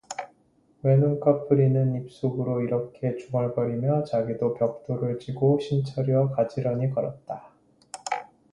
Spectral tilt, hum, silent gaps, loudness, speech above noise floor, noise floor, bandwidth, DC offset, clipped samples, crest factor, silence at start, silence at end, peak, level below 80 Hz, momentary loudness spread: -8 dB/octave; none; none; -26 LUFS; 38 dB; -63 dBFS; 11 kHz; under 0.1%; under 0.1%; 18 dB; 0.1 s; 0.3 s; -6 dBFS; -62 dBFS; 13 LU